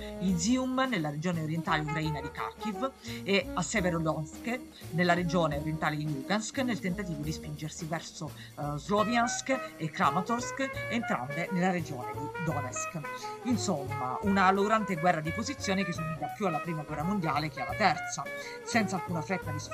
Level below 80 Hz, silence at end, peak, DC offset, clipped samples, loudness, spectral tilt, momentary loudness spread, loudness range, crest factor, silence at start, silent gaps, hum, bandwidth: -54 dBFS; 0 s; -8 dBFS; under 0.1%; under 0.1%; -31 LUFS; -5 dB/octave; 10 LU; 3 LU; 22 dB; 0 s; none; none; 15.5 kHz